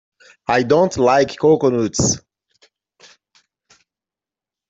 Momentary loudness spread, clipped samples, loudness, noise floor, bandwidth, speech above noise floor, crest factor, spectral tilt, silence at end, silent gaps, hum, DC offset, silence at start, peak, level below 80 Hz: 5 LU; under 0.1%; -16 LUFS; -89 dBFS; 8.2 kHz; 74 dB; 18 dB; -4.5 dB/octave; 2.5 s; none; none; under 0.1%; 0.5 s; -2 dBFS; -50 dBFS